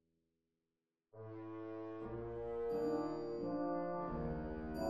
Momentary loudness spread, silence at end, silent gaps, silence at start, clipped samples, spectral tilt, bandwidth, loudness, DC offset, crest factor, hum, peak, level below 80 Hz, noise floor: 10 LU; 0 s; none; 1.15 s; under 0.1%; -8.5 dB/octave; 13 kHz; -43 LUFS; under 0.1%; 16 dB; none; -26 dBFS; -58 dBFS; under -90 dBFS